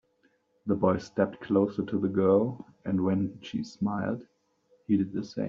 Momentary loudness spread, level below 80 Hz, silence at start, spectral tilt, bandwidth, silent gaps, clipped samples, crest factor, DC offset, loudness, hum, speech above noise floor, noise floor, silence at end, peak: 11 LU; -66 dBFS; 0.65 s; -7.5 dB/octave; 7.4 kHz; none; under 0.1%; 18 dB; under 0.1%; -29 LUFS; none; 42 dB; -69 dBFS; 0 s; -10 dBFS